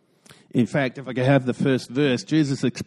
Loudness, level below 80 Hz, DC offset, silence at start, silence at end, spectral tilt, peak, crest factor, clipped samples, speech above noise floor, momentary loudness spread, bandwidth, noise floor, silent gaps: -22 LUFS; -62 dBFS; under 0.1%; 0.55 s; 0 s; -6.5 dB/octave; -6 dBFS; 18 dB; under 0.1%; 31 dB; 5 LU; 12 kHz; -53 dBFS; none